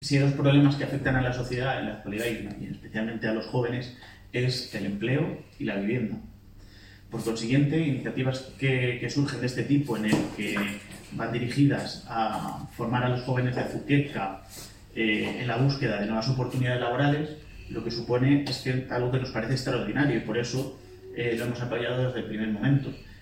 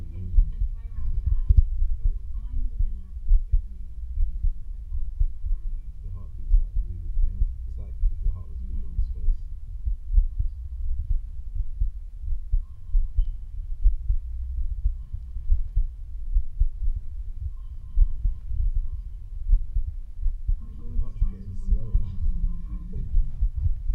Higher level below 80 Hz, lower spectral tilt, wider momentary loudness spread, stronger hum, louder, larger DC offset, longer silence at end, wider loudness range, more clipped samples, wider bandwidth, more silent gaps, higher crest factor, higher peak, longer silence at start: second, -52 dBFS vs -24 dBFS; second, -6.5 dB/octave vs -10 dB/octave; about the same, 11 LU vs 10 LU; neither; first, -28 LUFS vs -32 LUFS; neither; about the same, 0 s vs 0 s; about the same, 4 LU vs 4 LU; neither; first, 16 kHz vs 1.1 kHz; neither; about the same, 18 dB vs 20 dB; second, -10 dBFS vs -4 dBFS; about the same, 0 s vs 0 s